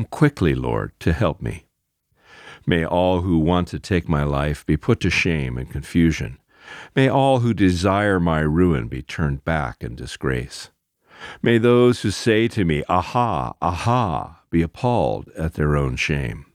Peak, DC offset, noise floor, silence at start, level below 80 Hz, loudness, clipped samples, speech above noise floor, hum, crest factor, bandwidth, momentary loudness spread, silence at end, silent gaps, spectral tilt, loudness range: -4 dBFS; under 0.1%; -71 dBFS; 0 s; -36 dBFS; -20 LUFS; under 0.1%; 51 dB; none; 18 dB; 14.5 kHz; 12 LU; 0.15 s; none; -6.5 dB/octave; 3 LU